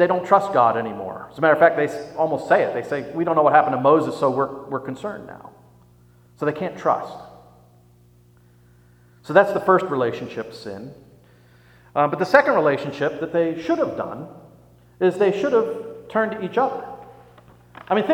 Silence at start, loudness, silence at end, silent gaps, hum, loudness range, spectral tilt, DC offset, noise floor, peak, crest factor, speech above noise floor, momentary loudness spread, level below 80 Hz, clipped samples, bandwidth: 0 s; -20 LUFS; 0 s; none; 60 Hz at -50 dBFS; 10 LU; -6.5 dB/octave; under 0.1%; -53 dBFS; 0 dBFS; 22 dB; 33 dB; 17 LU; -62 dBFS; under 0.1%; 14 kHz